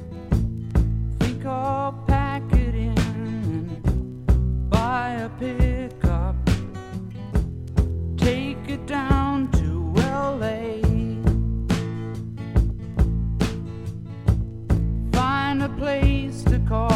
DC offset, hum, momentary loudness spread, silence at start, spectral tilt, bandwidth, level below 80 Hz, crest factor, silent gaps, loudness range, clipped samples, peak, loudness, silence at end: under 0.1%; none; 6 LU; 0 s; -7.5 dB/octave; 12.5 kHz; -26 dBFS; 16 dB; none; 2 LU; under 0.1%; -6 dBFS; -24 LUFS; 0 s